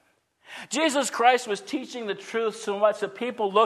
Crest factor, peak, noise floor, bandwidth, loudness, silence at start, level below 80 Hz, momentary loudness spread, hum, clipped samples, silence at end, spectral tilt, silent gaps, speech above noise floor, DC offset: 20 dB; -4 dBFS; -59 dBFS; 13.5 kHz; -26 LUFS; 0.5 s; -80 dBFS; 12 LU; none; under 0.1%; 0 s; -2.5 dB/octave; none; 34 dB; under 0.1%